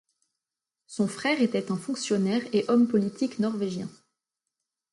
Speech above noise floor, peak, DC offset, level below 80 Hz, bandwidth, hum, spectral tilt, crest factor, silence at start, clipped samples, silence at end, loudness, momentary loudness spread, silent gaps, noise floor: 63 dB; -12 dBFS; under 0.1%; -72 dBFS; 11.5 kHz; none; -5.5 dB/octave; 16 dB; 0.9 s; under 0.1%; 1 s; -27 LUFS; 9 LU; none; -89 dBFS